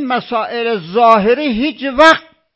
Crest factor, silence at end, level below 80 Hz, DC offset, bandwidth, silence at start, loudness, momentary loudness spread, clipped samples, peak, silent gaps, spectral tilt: 14 dB; 0.35 s; -46 dBFS; under 0.1%; 8 kHz; 0 s; -13 LUFS; 9 LU; 0.8%; 0 dBFS; none; -5 dB/octave